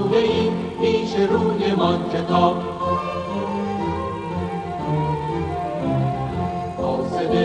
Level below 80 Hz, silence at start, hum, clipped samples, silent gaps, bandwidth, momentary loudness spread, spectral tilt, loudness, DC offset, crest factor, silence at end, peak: -44 dBFS; 0 s; none; under 0.1%; none; 10 kHz; 8 LU; -7.5 dB/octave; -22 LUFS; under 0.1%; 18 dB; 0 s; -2 dBFS